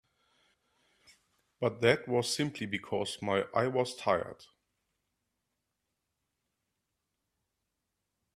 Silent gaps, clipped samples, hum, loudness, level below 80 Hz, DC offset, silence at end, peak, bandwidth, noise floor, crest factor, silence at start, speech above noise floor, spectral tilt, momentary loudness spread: none; under 0.1%; none; -32 LUFS; -72 dBFS; under 0.1%; 3.9 s; -10 dBFS; 14.5 kHz; -85 dBFS; 26 dB; 1.6 s; 53 dB; -4.5 dB/octave; 7 LU